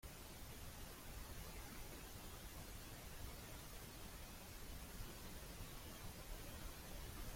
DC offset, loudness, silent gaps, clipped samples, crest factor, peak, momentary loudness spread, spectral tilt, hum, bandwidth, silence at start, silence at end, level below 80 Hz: under 0.1%; -54 LUFS; none; under 0.1%; 14 dB; -38 dBFS; 1 LU; -3.5 dB/octave; none; 16.5 kHz; 0.05 s; 0 s; -58 dBFS